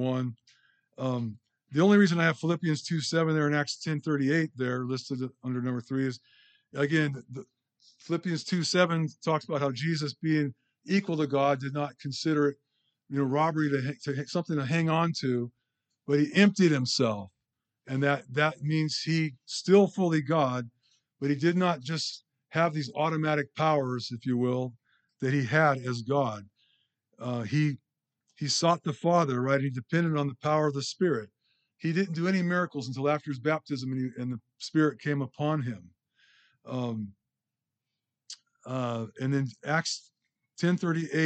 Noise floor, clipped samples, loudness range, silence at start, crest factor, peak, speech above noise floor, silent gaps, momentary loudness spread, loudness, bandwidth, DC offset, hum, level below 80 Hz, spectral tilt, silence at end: -88 dBFS; under 0.1%; 6 LU; 0 s; 22 dB; -6 dBFS; 60 dB; none; 11 LU; -29 LUFS; 9 kHz; under 0.1%; none; -78 dBFS; -6 dB/octave; 0 s